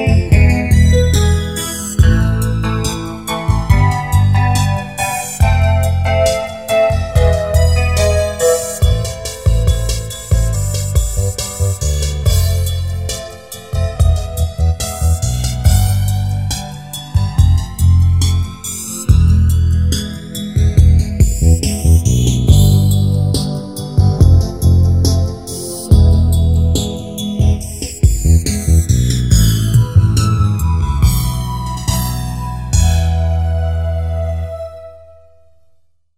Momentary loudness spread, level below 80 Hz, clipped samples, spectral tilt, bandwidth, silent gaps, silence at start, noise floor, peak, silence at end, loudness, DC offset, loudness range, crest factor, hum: 10 LU; -18 dBFS; under 0.1%; -5.5 dB/octave; 16 kHz; none; 0 s; -55 dBFS; 0 dBFS; 1.2 s; -14 LUFS; 0.6%; 5 LU; 12 dB; none